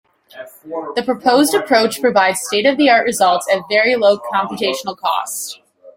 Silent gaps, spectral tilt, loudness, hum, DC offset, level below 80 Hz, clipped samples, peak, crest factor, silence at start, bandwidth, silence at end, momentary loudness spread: none; -2.5 dB/octave; -15 LUFS; none; under 0.1%; -62 dBFS; under 0.1%; -2 dBFS; 14 dB; 0.35 s; 16.5 kHz; 0.05 s; 14 LU